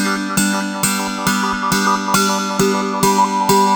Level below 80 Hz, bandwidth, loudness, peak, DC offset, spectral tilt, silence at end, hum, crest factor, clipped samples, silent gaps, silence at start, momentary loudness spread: -46 dBFS; over 20 kHz; -16 LUFS; 0 dBFS; under 0.1%; -3.5 dB/octave; 0 s; none; 16 dB; under 0.1%; none; 0 s; 3 LU